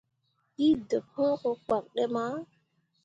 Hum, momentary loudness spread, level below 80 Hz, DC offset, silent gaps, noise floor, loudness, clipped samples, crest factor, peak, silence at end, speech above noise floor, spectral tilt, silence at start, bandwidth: none; 9 LU; -66 dBFS; under 0.1%; none; -72 dBFS; -29 LUFS; under 0.1%; 16 dB; -16 dBFS; 0.6 s; 44 dB; -6.5 dB/octave; 0.6 s; 7.8 kHz